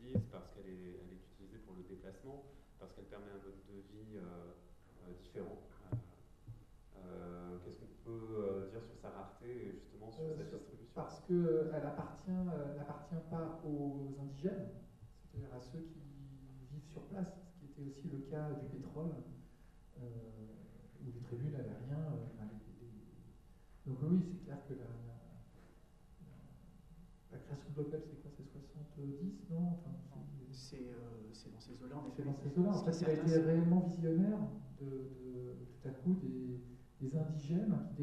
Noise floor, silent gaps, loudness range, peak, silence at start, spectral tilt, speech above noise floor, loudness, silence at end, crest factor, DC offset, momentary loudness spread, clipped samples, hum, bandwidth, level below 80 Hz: -63 dBFS; none; 16 LU; -20 dBFS; 0 s; -9 dB/octave; 23 dB; -42 LUFS; 0 s; 24 dB; under 0.1%; 22 LU; under 0.1%; none; 9.2 kHz; -64 dBFS